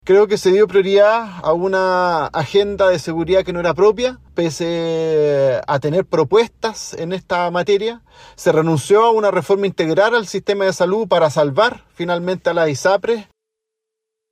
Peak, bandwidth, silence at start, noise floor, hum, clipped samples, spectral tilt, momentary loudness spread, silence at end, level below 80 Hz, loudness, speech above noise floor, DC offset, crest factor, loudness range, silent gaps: -4 dBFS; 14.5 kHz; 0.05 s; -80 dBFS; none; under 0.1%; -5.5 dB/octave; 8 LU; 1.1 s; -50 dBFS; -16 LUFS; 65 dB; under 0.1%; 14 dB; 3 LU; none